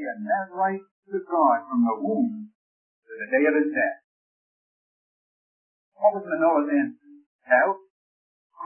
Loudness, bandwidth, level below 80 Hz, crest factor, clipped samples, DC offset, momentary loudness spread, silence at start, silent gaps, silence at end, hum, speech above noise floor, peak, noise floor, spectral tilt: -24 LUFS; 3 kHz; -84 dBFS; 20 dB; under 0.1%; under 0.1%; 14 LU; 0 s; 0.91-1.03 s, 2.55-3.02 s, 4.04-5.92 s, 7.26-7.39 s, 7.90-8.50 s; 0 s; none; over 67 dB; -6 dBFS; under -90 dBFS; -11.5 dB/octave